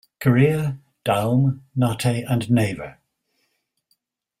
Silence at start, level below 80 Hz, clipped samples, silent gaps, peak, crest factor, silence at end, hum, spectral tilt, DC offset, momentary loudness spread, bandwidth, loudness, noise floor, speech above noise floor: 0.2 s; -54 dBFS; under 0.1%; none; -4 dBFS; 18 dB; 1.5 s; none; -7 dB/octave; under 0.1%; 11 LU; 15.5 kHz; -21 LUFS; -72 dBFS; 52 dB